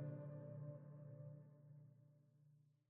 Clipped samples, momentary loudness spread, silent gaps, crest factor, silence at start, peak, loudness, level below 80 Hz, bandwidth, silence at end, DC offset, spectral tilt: under 0.1%; 12 LU; none; 16 dB; 0 s; -40 dBFS; -57 LUFS; under -90 dBFS; 2.5 kHz; 0.2 s; under 0.1%; -10.5 dB/octave